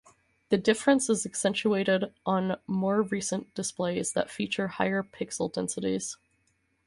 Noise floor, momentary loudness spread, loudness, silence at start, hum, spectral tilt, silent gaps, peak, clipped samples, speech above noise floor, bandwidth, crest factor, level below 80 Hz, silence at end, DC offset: -72 dBFS; 8 LU; -29 LUFS; 0.5 s; none; -4.5 dB/octave; none; -10 dBFS; under 0.1%; 44 dB; 11.5 kHz; 20 dB; -66 dBFS; 0.7 s; under 0.1%